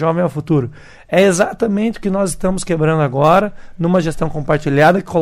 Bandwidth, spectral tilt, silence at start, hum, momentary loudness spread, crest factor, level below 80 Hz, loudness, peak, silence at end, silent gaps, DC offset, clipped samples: 15.5 kHz; -6 dB/octave; 0 s; none; 8 LU; 14 dB; -36 dBFS; -15 LUFS; -2 dBFS; 0 s; none; under 0.1%; under 0.1%